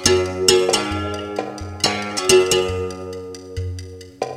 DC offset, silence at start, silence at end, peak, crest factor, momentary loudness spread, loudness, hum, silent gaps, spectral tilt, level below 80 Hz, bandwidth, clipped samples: under 0.1%; 0 s; 0 s; 0 dBFS; 20 dB; 17 LU; -19 LUFS; none; none; -3 dB/octave; -46 dBFS; 17 kHz; under 0.1%